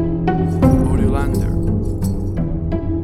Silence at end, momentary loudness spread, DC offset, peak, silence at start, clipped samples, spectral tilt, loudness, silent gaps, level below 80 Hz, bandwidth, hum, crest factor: 0 s; 7 LU; under 0.1%; 0 dBFS; 0 s; under 0.1%; -9 dB/octave; -18 LUFS; none; -22 dBFS; 14 kHz; none; 16 dB